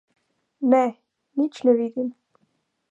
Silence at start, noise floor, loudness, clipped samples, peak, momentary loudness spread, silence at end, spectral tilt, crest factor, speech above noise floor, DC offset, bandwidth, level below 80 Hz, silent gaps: 0.6 s; -70 dBFS; -23 LUFS; under 0.1%; -6 dBFS; 11 LU; 0.8 s; -6.5 dB/octave; 20 dB; 50 dB; under 0.1%; 7.8 kHz; -84 dBFS; none